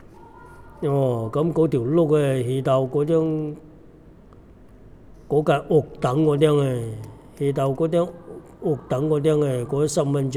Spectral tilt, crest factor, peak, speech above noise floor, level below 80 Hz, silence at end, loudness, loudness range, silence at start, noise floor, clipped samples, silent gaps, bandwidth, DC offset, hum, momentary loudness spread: -7.5 dB/octave; 18 dB; -4 dBFS; 26 dB; -50 dBFS; 0 s; -22 LUFS; 3 LU; 0.2 s; -47 dBFS; under 0.1%; none; 14 kHz; under 0.1%; none; 10 LU